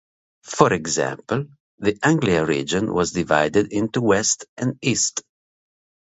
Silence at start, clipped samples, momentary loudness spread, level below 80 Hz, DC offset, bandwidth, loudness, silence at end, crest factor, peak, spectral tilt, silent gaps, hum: 0.45 s; under 0.1%; 8 LU; -50 dBFS; under 0.1%; 8.2 kHz; -21 LUFS; 0.9 s; 22 dB; 0 dBFS; -4 dB/octave; 1.60-1.78 s, 4.49-4.56 s; none